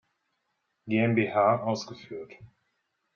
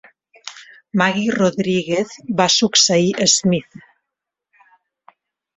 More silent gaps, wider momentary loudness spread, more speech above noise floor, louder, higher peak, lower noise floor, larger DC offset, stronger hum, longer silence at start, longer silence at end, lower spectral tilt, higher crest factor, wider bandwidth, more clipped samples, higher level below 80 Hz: neither; about the same, 18 LU vs 19 LU; second, 51 dB vs 65 dB; second, -26 LUFS vs -16 LUFS; second, -10 dBFS vs -2 dBFS; second, -78 dBFS vs -82 dBFS; neither; neither; first, 0.85 s vs 0.45 s; second, 0.7 s vs 1.95 s; first, -5.5 dB/octave vs -3 dB/octave; about the same, 20 dB vs 18 dB; second, 7.2 kHz vs 8.4 kHz; neither; second, -72 dBFS vs -60 dBFS